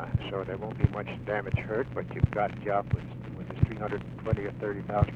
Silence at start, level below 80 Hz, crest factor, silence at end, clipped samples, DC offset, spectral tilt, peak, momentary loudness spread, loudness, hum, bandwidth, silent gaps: 0 s; -44 dBFS; 22 dB; 0 s; under 0.1%; under 0.1%; -9.5 dB/octave; -8 dBFS; 7 LU; -32 LUFS; none; 5.6 kHz; none